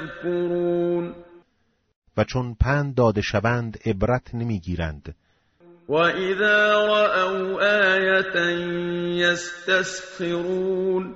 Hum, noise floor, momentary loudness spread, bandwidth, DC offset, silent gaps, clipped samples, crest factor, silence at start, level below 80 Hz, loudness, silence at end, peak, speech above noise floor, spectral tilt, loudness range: none; -68 dBFS; 10 LU; 8 kHz; under 0.1%; 1.96-2.02 s; under 0.1%; 16 dB; 0 s; -42 dBFS; -22 LUFS; 0 s; -6 dBFS; 46 dB; -4 dB/octave; 5 LU